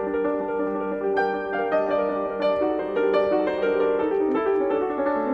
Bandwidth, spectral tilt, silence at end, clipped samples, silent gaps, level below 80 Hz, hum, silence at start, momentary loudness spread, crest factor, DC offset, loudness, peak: 5.8 kHz; -7.5 dB/octave; 0 s; under 0.1%; none; -56 dBFS; none; 0 s; 4 LU; 12 dB; under 0.1%; -24 LUFS; -12 dBFS